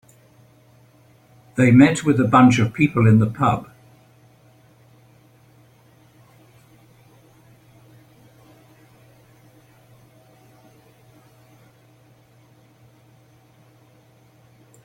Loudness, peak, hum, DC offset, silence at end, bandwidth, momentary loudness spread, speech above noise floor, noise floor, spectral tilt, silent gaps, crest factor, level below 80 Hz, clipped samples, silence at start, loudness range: -16 LUFS; -2 dBFS; none; under 0.1%; 11.25 s; 10.5 kHz; 8 LU; 39 dB; -54 dBFS; -7 dB/octave; none; 22 dB; -56 dBFS; under 0.1%; 1.55 s; 10 LU